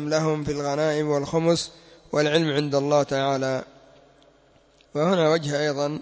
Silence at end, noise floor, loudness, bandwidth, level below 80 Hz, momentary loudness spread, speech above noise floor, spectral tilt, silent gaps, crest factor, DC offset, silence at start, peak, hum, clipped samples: 0 s; -58 dBFS; -23 LUFS; 8 kHz; -58 dBFS; 6 LU; 35 dB; -5.5 dB/octave; none; 18 dB; under 0.1%; 0 s; -6 dBFS; none; under 0.1%